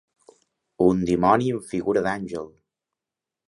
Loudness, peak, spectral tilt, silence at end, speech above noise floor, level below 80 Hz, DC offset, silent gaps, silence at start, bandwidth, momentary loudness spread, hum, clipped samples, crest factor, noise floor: -23 LUFS; -2 dBFS; -7 dB/octave; 1 s; 66 dB; -52 dBFS; under 0.1%; none; 0.8 s; 11.5 kHz; 14 LU; none; under 0.1%; 22 dB; -88 dBFS